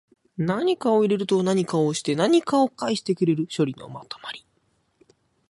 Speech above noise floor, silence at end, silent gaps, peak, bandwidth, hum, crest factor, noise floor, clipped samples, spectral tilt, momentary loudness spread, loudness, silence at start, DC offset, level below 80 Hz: 46 dB; 1.1 s; none; -8 dBFS; 11.5 kHz; none; 16 dB; -68 dBFS; under 0.1%; -6 dB/octave; 16 LU; -23 LUFS; 0.4 s; under 0.1%; -68 dBFS